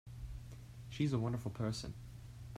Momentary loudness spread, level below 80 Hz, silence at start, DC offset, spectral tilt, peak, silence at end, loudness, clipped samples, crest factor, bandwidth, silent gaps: 16 LU; -56 dBFS; 0.05 s; under 0.1%; -6.5 dB/octave; -24 dBFS; 0 s; -41 LUFS; under 0.1%; 18 dB; 14.5 kHz; none